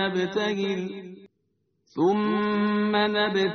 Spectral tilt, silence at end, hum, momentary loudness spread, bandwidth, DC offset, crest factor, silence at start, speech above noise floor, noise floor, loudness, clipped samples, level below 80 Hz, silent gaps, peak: -3.5 dB/octave; 0 s; none; 14 LU; 6.6 kHz; under 0.1%; 16 dB; 0 s; 49 dB; -73 dBFS; -25 LUFS; under 0.1%; -66 dBFS; none; -8 dBFS